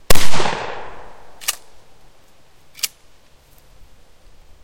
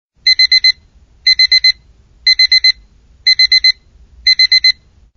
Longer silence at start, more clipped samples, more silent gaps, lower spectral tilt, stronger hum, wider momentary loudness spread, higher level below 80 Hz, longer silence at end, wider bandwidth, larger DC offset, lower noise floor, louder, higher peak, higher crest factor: second, 0.1 s vs 0.25 s; first, 0.4% vs under 0.1%; neither; first, -2.5 dB/octave vs 6.5 dB/octave; neither; first, 22 LU vs 14 LU; first, -34 dBFS vs -44 dBFS; first, 1.75 s vs 0.45 s; first, 17 kHz vs 6.6 kHz; neither; first, -52 dBFS vs -46 dBFS; second, -23 LUFS vs -8 LUFS; about the same, 0 dBFS vs 0 dBFS; about the same, 14 dB vs 12 dB